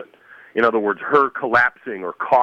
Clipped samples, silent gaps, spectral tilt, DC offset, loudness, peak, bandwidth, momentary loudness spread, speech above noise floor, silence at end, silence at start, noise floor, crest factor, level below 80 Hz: under 0.1%; none; -6.5 dB/octave; under 0.1%; -19 LUFS; -4 dBFS; 7.6 kHz; 11 LU; 28 dB; 0 s; 0 s; -47 dBFS; 16 dB; -64 dBFS